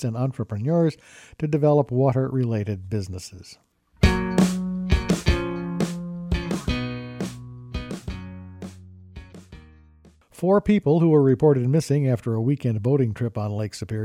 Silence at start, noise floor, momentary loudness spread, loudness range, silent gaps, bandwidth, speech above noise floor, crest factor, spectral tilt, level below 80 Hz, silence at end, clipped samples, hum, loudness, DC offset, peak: 0 s; -54 dBFS; 18 LU; 12 LU; none; 15 kHz; 32 dB; 20 dB; -7.5 dB/octave; -36 dBFS; 0 s; under 0.1%; none; -23 LUFS; under 0.1%; -4 dBFS